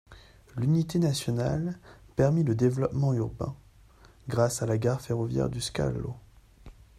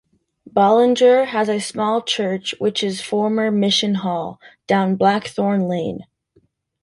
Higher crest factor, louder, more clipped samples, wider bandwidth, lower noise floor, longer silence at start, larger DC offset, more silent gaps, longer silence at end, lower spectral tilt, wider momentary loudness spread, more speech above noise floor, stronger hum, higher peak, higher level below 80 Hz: about the same, 18 dB vs 16 dB; second, -28 LUFS vs -18 LUFS; neither; first, 14 kHz vs 11.5 kHz; second, -56 dBFS vs -60 dBFS; second, 0.1 s vs 0.45 s; neither; neither; second, 0.25 s vs 0.8 s; first, -6.5 dB/octave vs -5 dB/octave; first, 13 LU vs 10 LU; second, 28 dB vs 42 dB; neither; second, -10 dBFS vs -2 dBFS; first, -50 dBFS vs -62 dBFS